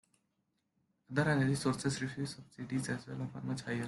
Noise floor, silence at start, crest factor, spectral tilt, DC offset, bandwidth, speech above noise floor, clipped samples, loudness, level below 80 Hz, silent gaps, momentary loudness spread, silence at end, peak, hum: -82 dBFS; 1.1 s; 18 dB; -5.5 dB/octave; under 0.1%; 12 kHz; 46 dB; under 0.1%; -36 LUFS; -68 dBFS; none; 11 LU; 0 s; -18 dBFS; none